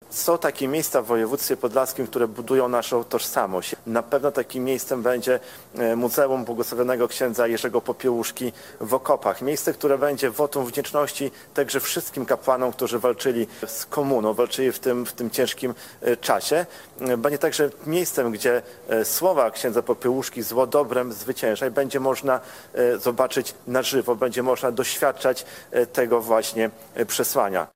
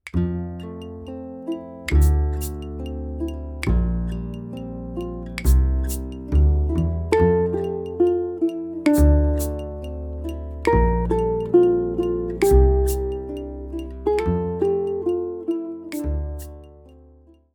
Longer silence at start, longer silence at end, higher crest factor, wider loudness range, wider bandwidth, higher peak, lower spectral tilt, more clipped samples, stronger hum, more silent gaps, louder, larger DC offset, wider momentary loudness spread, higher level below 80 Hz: about the same, 0.1 s vs 0.05 s; second, 0.05 s vs 0.65 s; about the same, 20 dB vs 18 dB; second, 1 LU vs 6 LU; second, 16.5 kHz vs over 20 kHz; about the same, -4 dBFS vs -4 dBFS; second, -3.5 dB/octave vs -7.5 dB/octave; neither; neither; neither; about the same, -23 LUFS vs -23 LUFS; neither; second, 6 LU vs 15 LU; second, -66 dBFS vs -24 dBFS